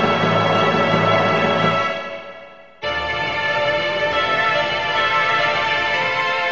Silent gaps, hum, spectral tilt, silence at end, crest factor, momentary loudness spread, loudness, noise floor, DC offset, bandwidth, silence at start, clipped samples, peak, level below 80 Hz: none; none; -5 dB/octave; 0 s; 16 dB; 7 LU; -18 LUFS; -41 dBFS; 0.5%; 7.8 kHz; 0 s; under 0.1%; -4 dBFS; -48 dBFS